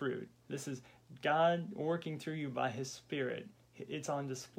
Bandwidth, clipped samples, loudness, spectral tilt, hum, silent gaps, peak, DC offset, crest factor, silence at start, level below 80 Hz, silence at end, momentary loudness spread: 16.5 kHz; under 0.1%; -38 LUFS; -5 dB/octave; none; none; -20 dBFS; under 0.1%; 18 dB; 0 s; -80 dBFS; 0.1 s; 15 LU